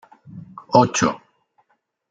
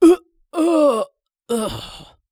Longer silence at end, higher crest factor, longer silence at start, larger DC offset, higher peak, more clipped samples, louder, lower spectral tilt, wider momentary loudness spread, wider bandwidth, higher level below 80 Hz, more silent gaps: first, 0.95 s vs 0.3 s; first, 22 dB vs 16 dB; first, 0.35 s vs 0 s; neither; about the same, -2 dBFS vs -2 dBFS; neither; about the same, -18 LUFS vs -19 LUFS; about the same, -4.5 dB/octave vs -5 dB/octave; first, 24 LU vs 16 LU; second, 9.4 kHz vs 14 kHz; second, -60 dBFS vs -50 dBFS; neither